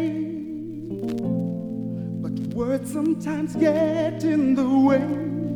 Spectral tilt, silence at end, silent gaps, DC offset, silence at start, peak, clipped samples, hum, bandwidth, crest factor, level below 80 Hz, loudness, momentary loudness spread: -8 dB/octave; 0 s; none; under 0.1%; 0 s; -8 dBFS; under 0.1%; none; 13.5 kHz; 16 dB; -56 dBFS; -24 LUFS; 11 LU